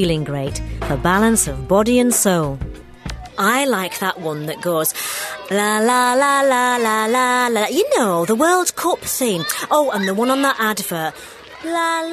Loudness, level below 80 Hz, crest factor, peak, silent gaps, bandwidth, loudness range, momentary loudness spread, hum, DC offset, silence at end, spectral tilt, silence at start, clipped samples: -17 LUFS; -38 dBFS; 16 dB; -2 dBFS; none; 14 kHz; 3 LU; 11 LU; none; under 0.1%; 0 s; -3.5 dB/octave; 0 s; under 0.1%